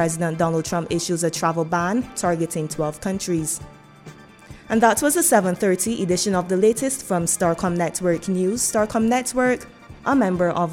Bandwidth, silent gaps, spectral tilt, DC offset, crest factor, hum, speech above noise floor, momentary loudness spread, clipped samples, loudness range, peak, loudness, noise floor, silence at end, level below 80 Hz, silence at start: 18 kHz; none; -4.5 dB/octave; under 0.1%; 20 dB; none; 23 dB; 8 LU; under 0.1%; 4 LU; -2 dBFS; -21 LUFS; -43 dBFS; 0 s; -50 dBFS; 0 s